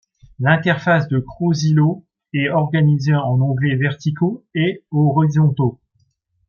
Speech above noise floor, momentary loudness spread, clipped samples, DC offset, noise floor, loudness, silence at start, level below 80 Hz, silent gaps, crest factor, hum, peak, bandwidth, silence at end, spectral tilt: 47 dB; 6 LU; under 0.1%; under 0.1%; -64 dBFS; -18 LUFS; 0.4 s; -54 dBFS; none; 16 dB; none; -2 dBFS; 6.8 kHz; 0.8 s; -7.5 dB/octave